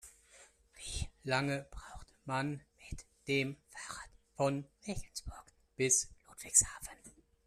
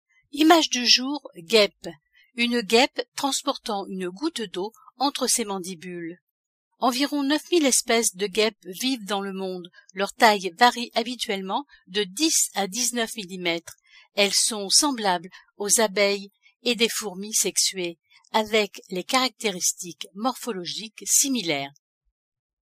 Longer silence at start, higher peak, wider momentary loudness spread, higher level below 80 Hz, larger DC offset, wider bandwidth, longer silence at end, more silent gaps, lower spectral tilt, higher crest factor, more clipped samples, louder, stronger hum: second, 0.05 s vs 0.35 s; second, -12 dBFS vs -2 dBFS; first, 23 LU vs 14 LU; first, -54 dBFS vs -68 dBFS; neither; second, 14 kHz vs 15.5 kHz; second, 0.35 s vs 0.9 s; second, none vs 3.08-3.12 s, 6.21-6.71 s, 16.56-16.60 s; first, -3 dB/octave vs -1.5 dB/octave; first, 28 dB vs 22 dB; neither; second, -35 LUFS vs -23 LUFS; neither